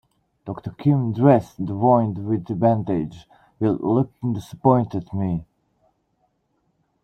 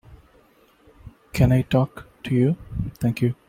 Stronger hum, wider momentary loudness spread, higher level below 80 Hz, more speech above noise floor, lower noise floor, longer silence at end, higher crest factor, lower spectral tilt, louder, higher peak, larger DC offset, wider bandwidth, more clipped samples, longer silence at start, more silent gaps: neither; about the same, 13 LU vs 12 LU; second, -54 dBFS vs -42 dBFS; first, 49 dB vs 36 dB; first, -69 dBFS vs -57 dBFS; first, 1.6 s vs 0.15 s; about the same, 20 dB vs 18 dB; first, -10 dB/octave vs -8 dB/octave; about the same, -21 LUFS vs -23 LUFS; first, -2 dBFS vs -6 dBFS; neither; second, 9 kHz vs 15.5 kHz; neither; first, 0.45 s vs 0.1 s; neither